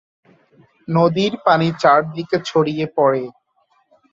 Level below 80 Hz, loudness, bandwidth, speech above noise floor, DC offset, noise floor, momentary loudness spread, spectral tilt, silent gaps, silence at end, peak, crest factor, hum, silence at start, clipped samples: -60 dBFS; -17 LUFS; 7.6 kHz; 46 dB; under 0.1%; -62 dBFS; 8 LU; -6.5 dB/octave; none; 0.8 s; -2 dBFS; 18 dB; none; 0.9 s; under 0.1%